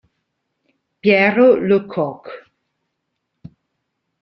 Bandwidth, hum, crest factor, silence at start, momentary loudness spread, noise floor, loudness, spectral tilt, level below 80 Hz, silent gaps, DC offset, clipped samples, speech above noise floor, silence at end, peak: 5.8 kHz; none; 18 dB; 1.05 s; 18 LU; -75 dBFS; -15 LUFS; -8.5 dB/octave; -60 dBFS; none; under 0.1%; under 0.1%; 60 dB; 1.85 s; -2 dBFS